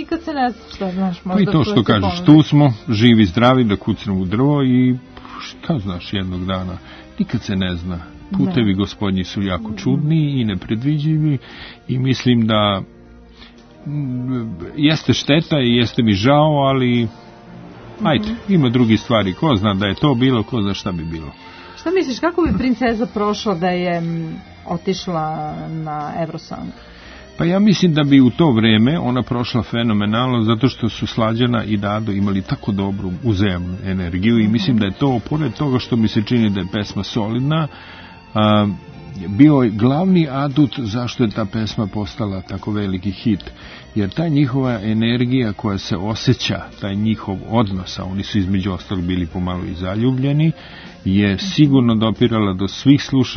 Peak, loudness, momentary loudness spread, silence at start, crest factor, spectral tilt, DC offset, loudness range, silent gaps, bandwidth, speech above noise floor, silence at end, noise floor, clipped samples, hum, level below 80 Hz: 0 dBFS; -17 LUFS; 13 LU; 0 s; 18 dB; -7 dB/octave; under 0.1%; 6 LU; none; 6.6 kHz; 25 dB; 0 s; -42 dBFS; under 0.1%; none; -44 dBFS